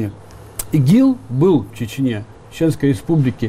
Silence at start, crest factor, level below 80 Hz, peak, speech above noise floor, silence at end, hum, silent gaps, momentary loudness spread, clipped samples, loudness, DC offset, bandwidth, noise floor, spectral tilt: 0 s; 12 dB; -44 dBFS; -4 dBFS; 21 dB; 0 s; none; none; 15 LU; under 0.1%; -17 LUFS; under 0.1%; 15.5 kHz; -37 dBFS; -7.5 dB/octave